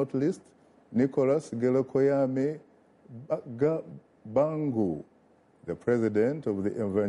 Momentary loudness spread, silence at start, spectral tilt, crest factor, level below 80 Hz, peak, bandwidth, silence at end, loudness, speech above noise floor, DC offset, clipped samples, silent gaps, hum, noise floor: 15 LU; 0 s; -8.5 dB/octave; 16 dB; -68 dBFS; -14 dBFS; 11 kHz; 0 s; -28 LUFS; 34 dB; under 0.1%; under 0.1%; none; none; -62 dBFS